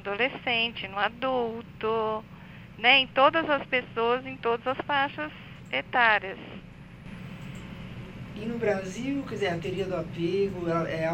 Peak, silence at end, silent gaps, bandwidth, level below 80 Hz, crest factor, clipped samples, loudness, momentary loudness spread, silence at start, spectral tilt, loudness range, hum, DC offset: -4 dBFS; 0 s; none; 16 kHz; -54 dBFS; 24 dB; under 0.1%; -27 LUFS; 19 LU; 0 s; -5 dB/octave; 8 LU; none; under 0.1%